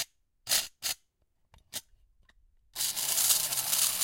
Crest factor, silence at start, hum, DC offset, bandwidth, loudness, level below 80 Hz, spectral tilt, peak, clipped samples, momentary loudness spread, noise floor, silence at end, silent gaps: 24 dB; 0 s; none; under 0.1%; 17 kHz; -27 LUFS; -68 dBFS; 2 dB/octave; -8 dBFS; under 0.1%; 18 LU; -74 dBFS; 0 s; none